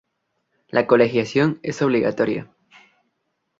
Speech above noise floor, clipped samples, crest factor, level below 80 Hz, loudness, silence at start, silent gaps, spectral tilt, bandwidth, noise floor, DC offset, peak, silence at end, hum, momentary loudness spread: 55 dB; under 0.1%; 20 dB; -62 dBFS; -20 LUFS; 0.75 s; none; -6.5 dB/octave; 7.8 kHz; -74 dBFS; under 0.1%; -2 dBFS; 1.15 s; none; 7 LU